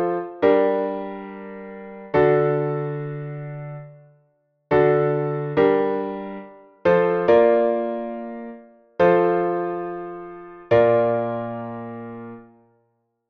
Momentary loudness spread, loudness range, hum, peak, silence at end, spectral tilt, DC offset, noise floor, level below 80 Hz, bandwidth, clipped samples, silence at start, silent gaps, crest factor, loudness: 19 LU; 4 LU; none; -4 dBFS; 0.85 s; -9.5 dB/octave; under 0.1%; -69 dBFS; -58 dBFS; 5.6 kHz; under 0.1%; 0 s; none; 18 dB; -21 LUFS